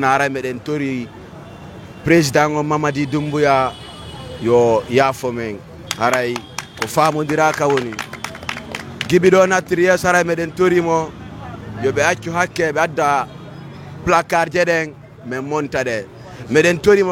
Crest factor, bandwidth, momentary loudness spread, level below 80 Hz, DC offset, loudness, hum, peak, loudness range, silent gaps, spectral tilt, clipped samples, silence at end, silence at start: 18 dB; 16.5 kHz; 19 LU; -48 dBFS; under 0.1%; -17 LUFS; none; 0 dBFS; 3 LU; none; -5 dB/octave; under 0.1%; 0 s; 0 s